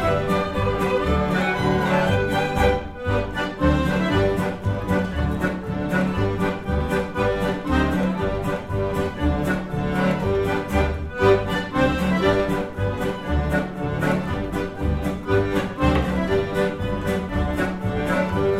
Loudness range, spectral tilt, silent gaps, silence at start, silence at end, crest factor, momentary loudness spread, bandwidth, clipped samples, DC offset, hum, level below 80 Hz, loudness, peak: 2 LU; -7 dB/octave; none; 0 s; 0 s; 18 dB; 5 LU; 15.5 kHz; under 0.1%; under 0.1%; none; -32 dBFS; -22 LUFS; -4 dBFS